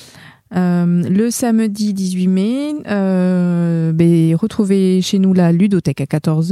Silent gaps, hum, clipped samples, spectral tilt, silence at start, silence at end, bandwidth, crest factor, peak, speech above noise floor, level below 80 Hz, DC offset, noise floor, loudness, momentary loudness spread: none; none; under 0.1%; -7 dB/octave; 0 s; 0 s; 14 kHz; 12 dB; -2 dBFS; 27 dB; -54 dBFS; under 0.1%; -41 dBFS; -15 LUFS; 6 LU